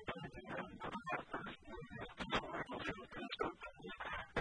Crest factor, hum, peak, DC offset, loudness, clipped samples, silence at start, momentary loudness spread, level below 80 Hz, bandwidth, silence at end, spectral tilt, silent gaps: 20 dB; none; -26 dBFS; under 0.1%; -46 LUFS; under 0.1%; 0 s; 10 LU; -64 dBFS; 10 kHz; 0 s; -5 dB/octave; none